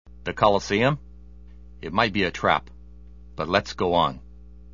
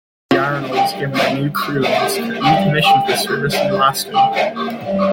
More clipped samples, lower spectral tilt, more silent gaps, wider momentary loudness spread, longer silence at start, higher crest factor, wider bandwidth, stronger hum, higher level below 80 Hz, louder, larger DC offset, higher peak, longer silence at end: neither; about the same, -5.5 dB/octave vs -4.5 dB/octave; neither; first, 13 LU vs 6 LU; second, 0.05 s vs 0.3 s; first, 22 dB vs 14 dB; second, 7.4 kHz vs 17 kHz; neither; first, -46 dBFS vs -52 dBFS; second, -23 LUFS vs -16 LUFS; first, 0.4% vs under 0.1%; about the same, -2 dBFS vs -2 dBFS; about the same, 0 s vs 0 s